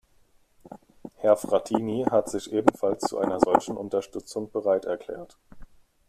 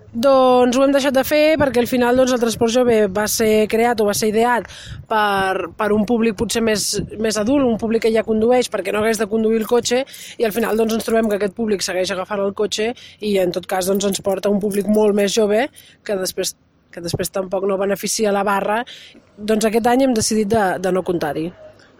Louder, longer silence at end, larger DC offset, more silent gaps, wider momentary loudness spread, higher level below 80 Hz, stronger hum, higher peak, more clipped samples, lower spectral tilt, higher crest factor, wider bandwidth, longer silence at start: second, -26 LUFS vs -18 LUFS; first, 0.45 s vs 0.3 s; neither; neither; first, 11 LU vs 8 LU; second, -58 dBFS vs -46 dBFS; neither; about the same, -2 dBFS vs -4 dBFS; neither; first, -5.5 dB/octave vs -4 dB/octave; first, 24 dB vs 14 dB; second, 14 kHz vs 17.5 kHz; first, 0.7 s vs 0.1 s